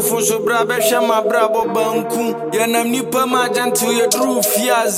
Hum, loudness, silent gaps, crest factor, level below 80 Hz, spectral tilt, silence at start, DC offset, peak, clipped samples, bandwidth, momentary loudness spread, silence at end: none; -16 LUFS; none; 14 dB; -64 dBFS; -2.5 dB/octave; 0 s; under 0.1%; -2 dBFS; under 0.1%; 16.5 kHz; 4 LU; 0 s